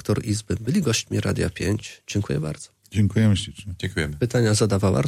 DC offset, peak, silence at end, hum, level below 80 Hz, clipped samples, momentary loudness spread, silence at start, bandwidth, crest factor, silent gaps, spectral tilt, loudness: under 0.1%; -8 dBFS; 0 s; none; -44 dBFS; under 0.1%; 10 LU; 0.05 s; 15 kHz; 14 dB; none; -5.5 dB/octave; -23 LUFS